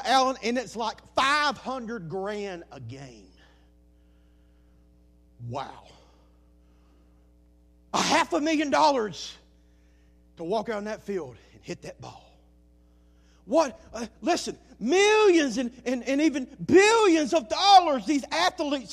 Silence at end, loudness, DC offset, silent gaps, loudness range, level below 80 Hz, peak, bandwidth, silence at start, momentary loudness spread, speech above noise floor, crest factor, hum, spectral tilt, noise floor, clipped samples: 0 s; -24 LUFS; under 0.1%; none; 23 LU; -58 dBFS; -6 dBFS; 14.5 kHz; 0 s; 21 LU; 33 dB; 22 dB; none; -3.5 dB/octave; -58 dBFS; under 0.1%